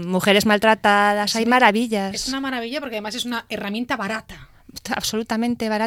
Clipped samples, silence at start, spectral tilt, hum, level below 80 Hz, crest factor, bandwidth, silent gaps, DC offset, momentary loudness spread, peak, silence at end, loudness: under 0.1%; 0 s; -3.5 dB/octave; none; -52 dBFS; 20 dB; 17 kHz; none; under 0.1%; 12 LU; 0 dBFS; 0 s; -20 LUFS